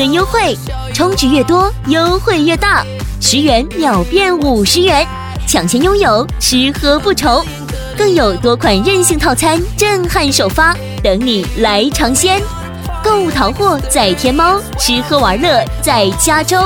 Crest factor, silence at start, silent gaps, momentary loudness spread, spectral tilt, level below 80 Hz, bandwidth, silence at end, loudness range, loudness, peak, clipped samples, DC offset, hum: 12 dB; 0 s; none; 5 LU; -3.5 dB/octave; -24 dBFS; 18.5 kHz; 0 s; 1 LU; -11 LUFS; 0 dBFS; under 0.1%; under 0.1%; none